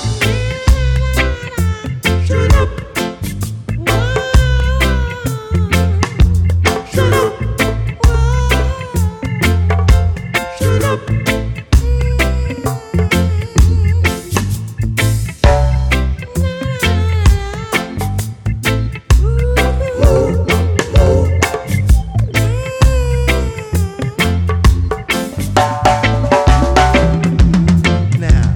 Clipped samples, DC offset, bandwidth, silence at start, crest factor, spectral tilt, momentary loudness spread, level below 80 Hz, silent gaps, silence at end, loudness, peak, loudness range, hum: under 0.1%; under 0.1%; 18 kHz; 0 s; 12 dB; -5.5 dB/octave; 7 LU; -16 dBFS; none; 0 s; -14 LUFS; 0 dBFS; 3 LU; none